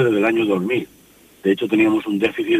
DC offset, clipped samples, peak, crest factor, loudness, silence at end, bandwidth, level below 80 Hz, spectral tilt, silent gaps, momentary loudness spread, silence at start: under 0.1%; under 0.1%; -4 dBFS; 16 dB; -19 LUFS; 0 s; 15 kHz; -60 dBFS; -6.5 dB/octave; none; 8 LU; 0 s